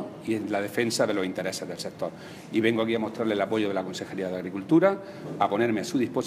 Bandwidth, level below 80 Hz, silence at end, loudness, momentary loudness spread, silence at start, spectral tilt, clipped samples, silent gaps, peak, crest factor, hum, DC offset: 15.5 kHz; -70 dBFS; 0 s; -27 LUFS; 10 LU; 0 s; -5 dB/octave; under 0.1%; none; -8 dBFS; 20 dB; none; under 0.1%